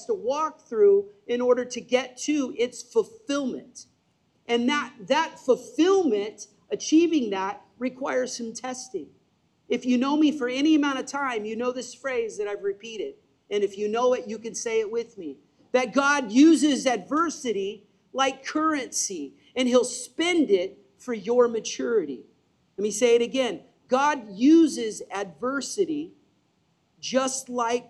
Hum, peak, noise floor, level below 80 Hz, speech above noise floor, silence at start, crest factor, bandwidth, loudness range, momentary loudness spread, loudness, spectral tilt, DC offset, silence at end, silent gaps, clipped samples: none; -8 dBFS; -68 dBFS; -74 dBFS; 44 dB; 0 s; 18 dB; 12 kHz; 5 LU; 14 LU; -25 LUFS; -3 dB/octave; under 0.1%; 0.05 s; none; under 0.1%